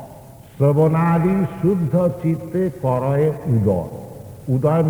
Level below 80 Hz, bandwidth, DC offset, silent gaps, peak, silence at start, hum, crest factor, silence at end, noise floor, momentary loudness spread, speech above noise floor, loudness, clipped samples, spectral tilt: -48 dBFS; over 20 kHz; under 0.1%; none; -4 dBFS; 0 s; none; 14 dB; 0 s; -41 dBFS; 14 LU; 23 dB; -19 LUFS; under 0.1%; -10 dB/octave